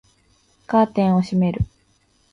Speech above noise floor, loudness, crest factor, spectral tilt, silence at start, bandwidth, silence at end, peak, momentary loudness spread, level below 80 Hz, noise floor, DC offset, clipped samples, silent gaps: 43 dB; -20 LUFS; 16 dB; -8.5 dB/octave; 0.7 s; 7.4 kHz; 0.7 s; -4 dBFS; 9 LU; -42 dBFS; -61 dBFS; under 0.1%; under 0.1%; none